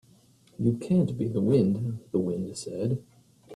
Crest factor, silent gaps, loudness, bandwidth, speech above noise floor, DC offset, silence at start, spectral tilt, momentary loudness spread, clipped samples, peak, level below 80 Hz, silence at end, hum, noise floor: 16 dB; none; -28 LUFS; 11.5 kHz; 33 dB; under 0.1%; 0.6 s; -8.5 dB/octave; 9 LU; under 0.1%; -12 dBFS; -60 dBFS; 0 s; none; -59 dBFS